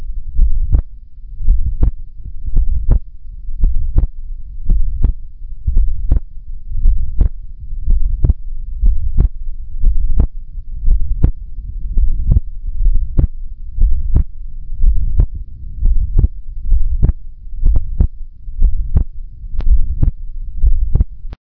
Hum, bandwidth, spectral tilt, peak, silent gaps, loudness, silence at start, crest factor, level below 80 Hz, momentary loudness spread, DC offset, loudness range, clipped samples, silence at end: none; 1.2 kHz; -12.5 dB/octave; 0 dBFS; none; -20 LUFS; 0 s; 12 dB; -14 dBFS; 15 LU; under 0.1%; 2 LU; under 0.1%; 0.1 s